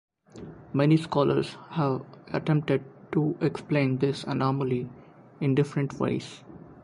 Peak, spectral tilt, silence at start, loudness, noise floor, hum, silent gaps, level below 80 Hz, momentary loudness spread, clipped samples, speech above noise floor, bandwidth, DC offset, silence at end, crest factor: -10 dBFS; -8 dB/octave; 0.35 s; -27 LUFS; -45 dBFS; none; none; -62 dBFS; 17 LU; under 0.1%; 19 dB; 11 kHz; under 0.1%; 0.05 s; 18 dB